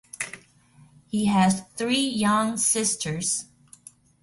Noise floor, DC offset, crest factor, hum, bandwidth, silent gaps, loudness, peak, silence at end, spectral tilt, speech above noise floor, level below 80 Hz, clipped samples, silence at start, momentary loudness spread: -56 dBFS; under 0.1%; 16 dB; none; 11.5 kHz; none; -24 LUFS; -10 dBFS; 0.8 s; -3.5 dB/octave; 32 dB; -60 dBFS; under 0.1%; 0.2 s; 13 LU